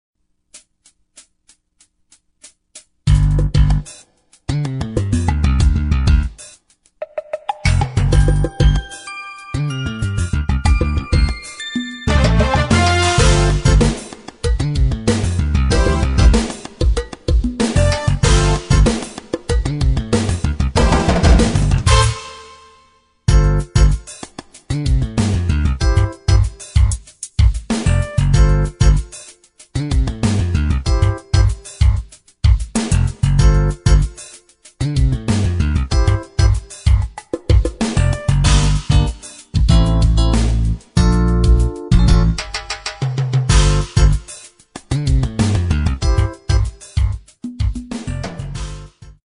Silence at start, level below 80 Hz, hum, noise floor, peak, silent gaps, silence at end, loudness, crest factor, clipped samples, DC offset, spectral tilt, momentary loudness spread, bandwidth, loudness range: 0.55 s; -18 dBFS; none; -58 dBFS; 0 dBFS; none; 0.15 s; -17 LUFS; 14 dB; under 0.1%; under 0.1%; -5.5 dB/octave; 12 LU; 11 kHz; 4 LU